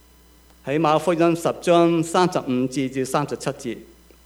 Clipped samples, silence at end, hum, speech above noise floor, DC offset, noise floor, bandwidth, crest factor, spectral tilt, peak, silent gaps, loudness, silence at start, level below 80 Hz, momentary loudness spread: under 0.1%; 0.4 s; none; 31 dB; under 0.1%; -52 dBFS; 15.5 kHz; 18 dB; -5.5 dB/octave; -4 dBFS; none; -21 LUFS; 0.65 s; -56 dBFS; 13 LU